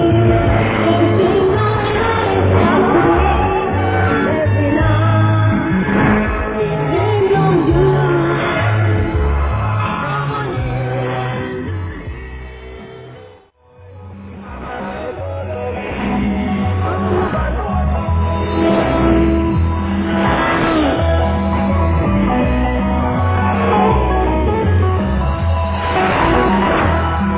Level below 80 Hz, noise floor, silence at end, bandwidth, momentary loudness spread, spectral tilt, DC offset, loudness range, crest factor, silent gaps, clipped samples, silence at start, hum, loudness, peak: -24 dBFS; -45 dBFS; 0 s; 4 kHz; 11 LU; -11.5 dB/octave; under 0.1%; 11 LU; 14 dB; none; under 0.1%; 0 s; none; -15 LUFS; 0 dBFS